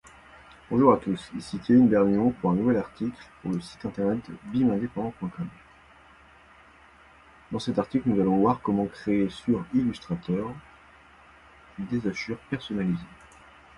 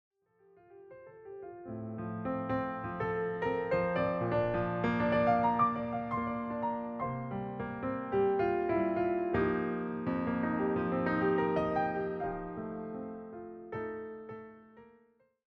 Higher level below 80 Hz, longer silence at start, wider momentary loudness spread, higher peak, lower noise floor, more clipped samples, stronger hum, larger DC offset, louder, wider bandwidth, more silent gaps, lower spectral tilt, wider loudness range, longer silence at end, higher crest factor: about the same, -56 dBFS vs -58 dBFS; about the same, 0.7 s vs 0.7 s; about the same, 15 LU vs 15 LU; first, -6 dBFS vs -16 dBFS; second, -54 dBFS vs -68 dBFS; neither; neither; neither; first, -26 LUFS vs -33 LUFS; first, 11 kHz vs 6 kHz; neither; second, -8 dB/octave vs -9.5 dB/octave; about the same, 9 LU vs 8 LU; about the same, 0.7 s vs 0.65 s; about the same, 20 dB vs 16 dB